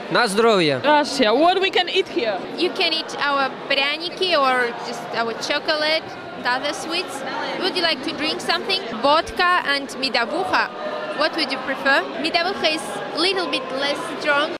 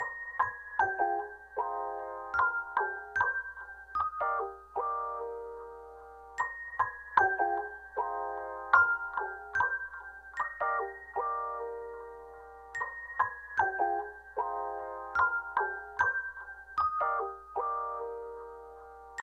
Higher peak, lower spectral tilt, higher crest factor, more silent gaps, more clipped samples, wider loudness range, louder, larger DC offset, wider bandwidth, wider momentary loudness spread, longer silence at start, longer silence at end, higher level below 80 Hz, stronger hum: first, -4 dBFS vs -8 dBFS; second, -3 dB/octave vs -4.5 dB/octave; second, 16 dB vs 26 dB; neither; neither; about the same, 3 LU vs 5 LU; first, -20 LUFS vs -33 LUFS; neither; first, 15.5 kHz vs 9.6 kHz; second, 8 LU vs 15 LU; about the same, 0 s vs 0 s; about the same, 0 s vs 0 s; first, -58 dBFS vs -64 dBFS; neither